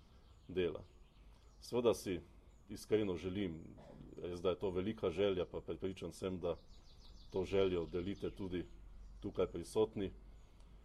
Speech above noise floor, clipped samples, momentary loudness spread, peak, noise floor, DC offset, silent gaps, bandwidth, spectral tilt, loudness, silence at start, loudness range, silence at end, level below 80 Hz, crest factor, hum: 22 dB; under 0.1%; 18 LU; -20 dBFS; -62 dBFS; under 0.1%; none; 13.5 kHz; -6 dB/octave; -40 LUFS; 0 s; 2 LU; 0 s; -60 dBFS; 20 dB; none